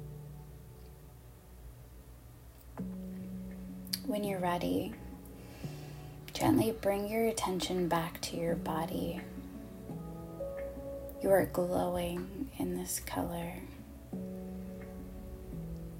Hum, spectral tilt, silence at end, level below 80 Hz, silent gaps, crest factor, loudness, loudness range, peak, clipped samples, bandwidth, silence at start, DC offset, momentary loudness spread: none; -5.5 dB/octave; 0 s; -52 dBFS; none; 24 dB; -36 LUFS; 9 LU; -14 dBFS; under 0.1%; 16 kHz; 0 s; under 0.1%; 21 LU